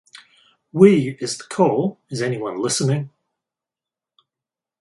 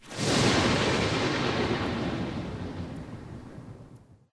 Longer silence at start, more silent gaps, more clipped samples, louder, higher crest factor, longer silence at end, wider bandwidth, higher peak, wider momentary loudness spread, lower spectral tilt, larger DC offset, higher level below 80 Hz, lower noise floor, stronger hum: first, 0.75 s vs 0 s; neither; neither; first, -19 LUFS vs -27 LUFS; about the same, 20 dB vs 18 dB; first, 1.7 s vs 0.15 s; about the same, 11.5 kHz vs 11 kHz; first, 0 dBFS vs -12 dBFS; second, 13 LU vs 20 LU; about the same, -5.5 dB/octave vs -4.5 dB/octave; neither; second, -64 dBFS vs -46 dBFS; first, -89 dBFS vs -52 dBFS; neither